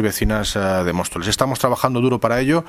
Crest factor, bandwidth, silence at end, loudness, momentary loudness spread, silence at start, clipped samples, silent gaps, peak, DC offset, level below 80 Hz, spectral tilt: 18 dB; 16 kHz; 0 s; -19 LUFS; 3 LU; 0 s; under 0.1%; none; 0 dBFS; under 0.1%; -34 dBFS; -5 dB/octave